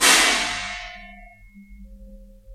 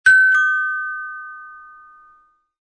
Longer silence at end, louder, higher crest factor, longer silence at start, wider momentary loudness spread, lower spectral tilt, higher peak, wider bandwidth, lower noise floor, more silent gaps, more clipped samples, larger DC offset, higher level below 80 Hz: second, 0 s vs 1.1 s; about the same, -18 LUFS vs -16 LUFS; first, 24 dB vs 16 dB; about the same, 0 s vs 0.05 s; about the same, 23 LU vs 25 LU; about the same, 0.5 dB/octave vs 1.5 dB/octave; first, 0 dBFS vs -4 dBFS; first, 16 kHz vs 11 kHz; second, -46 dBFS vs -55 dBFS; neither; neither; neither; first, -46 dBFS vs -68 dBFS